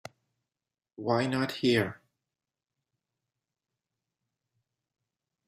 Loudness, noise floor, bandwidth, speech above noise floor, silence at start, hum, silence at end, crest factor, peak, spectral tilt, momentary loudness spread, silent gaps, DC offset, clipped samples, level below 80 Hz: -29 LUFS; under -90 dBFS; 15.5 kHz; over 62 dB; 1 s; none; 3.55 s; 22 dB; -14 dBFS; -6 dB/octave; 9 LU; none; under 0.1%; under 0.1%; -72 dBFS